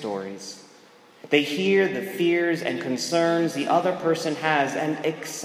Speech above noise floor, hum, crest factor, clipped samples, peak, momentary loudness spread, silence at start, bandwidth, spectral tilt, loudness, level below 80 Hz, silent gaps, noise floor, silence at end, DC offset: 28 dB; none; 20 dB; under 0.1%; -4 dBFS; 10 LU; 0 s; 16 kHz; -4.5 dB/octave; -23 LUFS; -78 dBFS; none; -52 dBFS; 0 s; under 0.1%